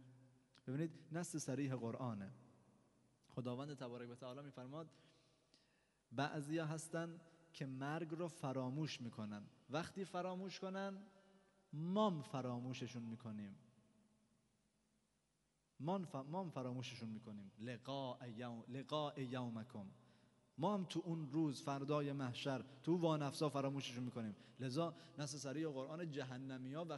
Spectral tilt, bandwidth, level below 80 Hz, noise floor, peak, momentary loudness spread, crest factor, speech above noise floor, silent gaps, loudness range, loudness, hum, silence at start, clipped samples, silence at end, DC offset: -6 dB/octave; 11.5 kHz; -88 dBFS; -84 dBFS; -26 dBFS; 12 LU; 22 dB; 38 dB; none; 9 LU; -46 LUFS; none; 0 s; under 0.1%; 0 s; under 0.1%